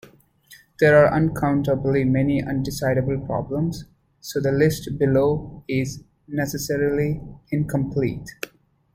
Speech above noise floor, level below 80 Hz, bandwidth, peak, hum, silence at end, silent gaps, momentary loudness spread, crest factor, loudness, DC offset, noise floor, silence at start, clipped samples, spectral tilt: 30 dB; -46 dBFS; 16 kHz; -4 dBFS; none; 0.5 s; none; 13 LU; 18 dB; -22 LUFS; under 0.1%; -51 dBFS; 0.5 s; under 0.1%; -6.5 dB/octave